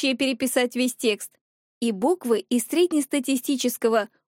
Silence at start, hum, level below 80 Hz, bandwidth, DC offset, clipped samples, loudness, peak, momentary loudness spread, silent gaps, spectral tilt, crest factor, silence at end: 0 s; none; -76 dBFS; 17 kHz; under 0.1%; under 0.1%; -24 LUFS; -8 dBFS; 5 LU; 1.41-1.81 s; -3 dB/octave; 16 dB; 0.3 s